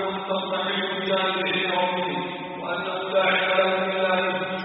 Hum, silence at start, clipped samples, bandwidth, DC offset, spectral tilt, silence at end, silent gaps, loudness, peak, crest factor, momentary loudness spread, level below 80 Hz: none; 0 s; under 0.1%; 4.5 kHz; under 0.1%; -1.5 dB/octave; 0 s; none; -24 LUFS; -8 dBFS; 16 dB; 8 LU; -70 dBFS